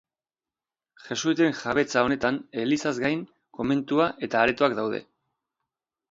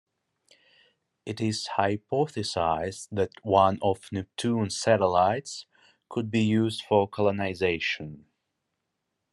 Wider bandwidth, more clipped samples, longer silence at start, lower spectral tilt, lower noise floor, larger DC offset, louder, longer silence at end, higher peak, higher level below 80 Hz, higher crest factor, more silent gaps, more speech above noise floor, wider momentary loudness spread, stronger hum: second, 7.8 kHz vs 12 kHz; neither; second, 1.05 s vs 1.25 s; about the same, -5 dB/octave vs -5.5 dB/octave; first, under -90 dBFS vs -81 dBFS; neither; about the same, -25 LUFS vs -27 LUFS; about the same, 1.1 s vs 1.15 s; about the same, -6 dBFS vs -6 dBFS; about the same, -60 dBFS vs -64 dBFS; about the same, 22 dB vs 22 dB; neither; first, over 65 dB vs 55 dB; second, 9 LU vs 12 LU; neither